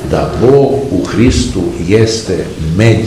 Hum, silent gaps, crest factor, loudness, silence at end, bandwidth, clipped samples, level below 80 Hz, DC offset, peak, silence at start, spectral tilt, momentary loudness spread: none; none; 10 dB; -11 LUFS; 0 s; 13 kHz; 1%; -24 dBFS; 0.4%; 0 dBFS; 0 s; -6 dB/octave; 8 LU